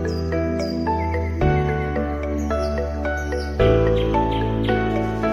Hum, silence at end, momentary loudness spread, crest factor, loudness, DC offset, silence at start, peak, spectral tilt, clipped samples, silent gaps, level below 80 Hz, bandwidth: none; 0 s; 6 LU; 16 dB; -22 LUFS; under 0.1%; 0 s; -6 dBFS; -7.5 dB/octave; under 0.1%; none; -28 dBFS; 11 kHz